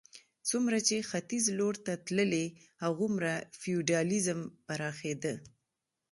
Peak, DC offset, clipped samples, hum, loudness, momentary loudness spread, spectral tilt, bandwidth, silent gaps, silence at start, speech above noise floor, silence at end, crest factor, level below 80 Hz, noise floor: -14 dBFS; under 0.1%; under 0.1%; none; -33 LUFS; 8 LU; -4 dB/octave; 11.5 kHz; none; 0.15 s; 54 dB; 0.65 s; 20 dB; -74 dBFS; -86 dBFS